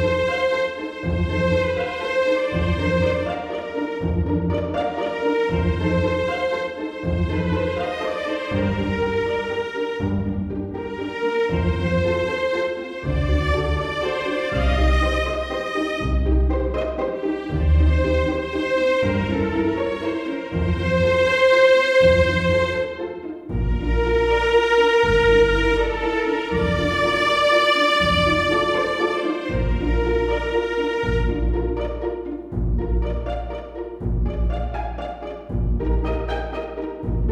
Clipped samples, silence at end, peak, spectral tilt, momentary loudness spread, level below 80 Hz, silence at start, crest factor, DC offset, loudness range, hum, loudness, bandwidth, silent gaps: under 0.1%; 0 s; -4 dBFS; -6.5 dB/octave; 11 LU; -28 dBFS; 0 s; 16 dB; under 0.1%; 7 LU; none; -21 LUFS; 11.5 kHz; none